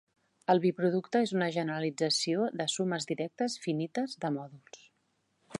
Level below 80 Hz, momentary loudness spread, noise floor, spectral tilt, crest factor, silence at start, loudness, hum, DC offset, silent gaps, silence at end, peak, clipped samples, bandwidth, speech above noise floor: -82 dBFS; 8 LU; -76 dBFS; -4.5 dB/octave; 20 dB; 0.5 s; -31 LUFS; none; under 0.1%; none; 0 s; -12 dBFS; under 0.1%; 11.5 kHz; 45 dB